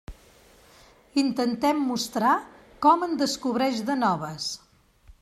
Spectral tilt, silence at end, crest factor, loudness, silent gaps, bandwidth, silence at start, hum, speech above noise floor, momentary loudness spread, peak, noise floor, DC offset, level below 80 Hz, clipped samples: -4 dB/octave; 0.1 s; 20 dB; -25 LUFS; none; 15.5 kHz; 0.1 s; none; 31 dB; 9 LU; -6 dBFS; -55 dBFS; under 0.1%; -56 dBFS; under 0.1%